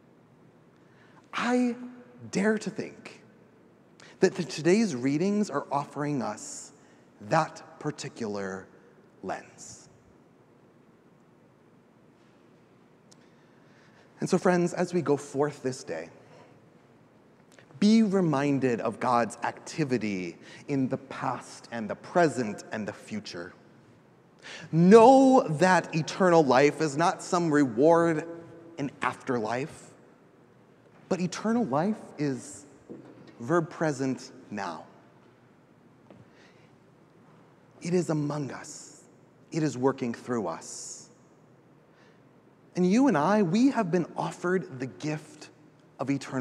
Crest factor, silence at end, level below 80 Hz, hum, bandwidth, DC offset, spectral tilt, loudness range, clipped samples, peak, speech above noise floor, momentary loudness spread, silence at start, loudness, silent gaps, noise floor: 24 dB; 0 s; -76 dBFS; none; 12 kHz; under 0.1%; -6 dB/octave; 13 LU; under 0.1%; -4 dBFS; 33 dB; 20 LU; 1.35 s; -27 LUFS; none; -59 dBFS